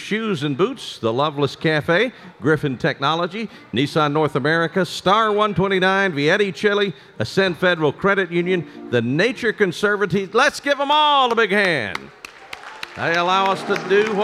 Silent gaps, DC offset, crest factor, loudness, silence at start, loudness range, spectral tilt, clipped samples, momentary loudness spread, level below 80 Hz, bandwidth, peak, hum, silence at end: none; under 0.1%; 16 dB; -19 LUFS; 0 s; 3 LU; -5 dB/octave; under 0.1%; 9 LU; -56 dBFS; 14 kHz; -2 dBFS; none; 0 s